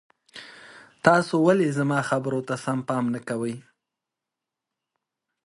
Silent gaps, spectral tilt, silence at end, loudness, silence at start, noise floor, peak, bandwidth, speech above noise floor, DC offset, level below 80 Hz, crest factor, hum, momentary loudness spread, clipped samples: none; -6.5 dB/octave; 1.85 s; -24 LUFS; 0.35 s; -87 dBFS; 0 dBFS; 11.5 kHz; 64 dB; under 0.1%; -68 dBFS; 26 dB; none; 22 LU; under 0.1%